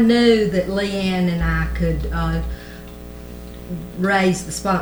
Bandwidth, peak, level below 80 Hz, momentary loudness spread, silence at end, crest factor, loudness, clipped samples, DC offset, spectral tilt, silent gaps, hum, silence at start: over 20 kHz; -4 dBFS; -30 dBFS; 20 LU; 0 s; 16 dB; -20 LUFS; under 0.1%; under 0.1%; -6 dB/octave; none; 60 Hz at -30 dBFS; 0 s